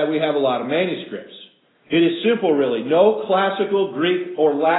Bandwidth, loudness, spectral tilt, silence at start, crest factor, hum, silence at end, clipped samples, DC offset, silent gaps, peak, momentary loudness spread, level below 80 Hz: 4.1 kHz; -19 LUFS; -10.5 dB/octave; 0 s; 16 dB; none; 0 s; under 0.1%; under 0.1%; none; -2 dBFS; 6 LU; -72 dBFS